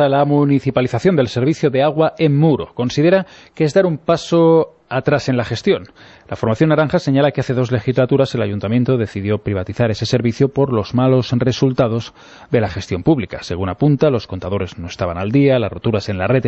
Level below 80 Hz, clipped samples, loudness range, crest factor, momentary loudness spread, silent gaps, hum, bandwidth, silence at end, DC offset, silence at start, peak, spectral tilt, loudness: -46 dBFS; under 0.1%; 2 LU; 14 dB; 8 LU; none; none; 8.2 kHz; 0 s; under 0.1%; 0 s; -2 dBFS; -7.5 dB/octave; -17 LUFS